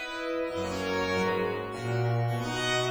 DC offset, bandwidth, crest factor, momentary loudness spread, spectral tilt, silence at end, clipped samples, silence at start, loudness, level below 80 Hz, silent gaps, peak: under 0.1%; over 20 kHz; 14 dB; 4 LU; -5 dB/octave; 0 s; under 0.1%; 0 s; -30 LUFS; -56 dBFS; none; -16 dBFS